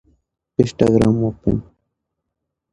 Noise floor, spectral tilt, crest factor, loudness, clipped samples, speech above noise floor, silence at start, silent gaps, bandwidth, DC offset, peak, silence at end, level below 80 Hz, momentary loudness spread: -79 dBFS; -8 dB/octave; 20 dB; -18 LUFS; under 0.1%; 62 dB; 0.6 s; none; 11 kHz; under 0.1%; 0 dBFS; 1.1 s; -40 dBFS; 10 LU